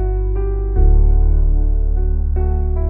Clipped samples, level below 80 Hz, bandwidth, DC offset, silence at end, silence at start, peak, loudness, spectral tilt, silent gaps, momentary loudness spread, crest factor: under 0.1%; -14 dBFS; 1.7 kHz; under 0.1%; 0 s; 0 s; -4 dBFS; -18 LUFS; -14.5 dB/octave; none; 5 LU; 10 dB